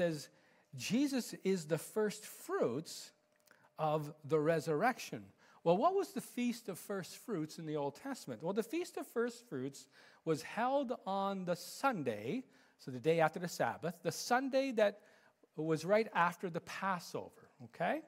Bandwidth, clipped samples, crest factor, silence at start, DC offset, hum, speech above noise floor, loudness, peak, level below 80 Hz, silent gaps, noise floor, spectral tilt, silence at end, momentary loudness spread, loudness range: 16 kHz; under 0.1%; 20 dB; 0 s; under 0.1%; none; 32 dB; -38 LUFS; -18 dBFS; -86 dBFS; none; -70 dBFS; -5 dB/octave; 0 s; 13 LU; 5 LU